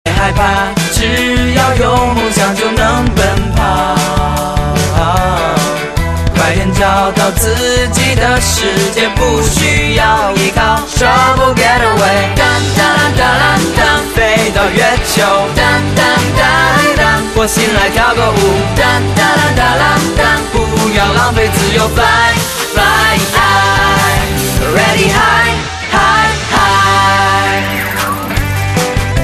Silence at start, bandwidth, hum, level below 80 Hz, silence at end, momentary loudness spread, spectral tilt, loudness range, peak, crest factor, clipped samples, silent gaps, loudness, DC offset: 0.05 s; 14.5 kHz; none; -22 dBFS; 0 s; 5 LU; -4 dB/octave; 2 LU; 0 dBFS; 10 dB; under 0.1%; none; -10 LUFS; under 0.1%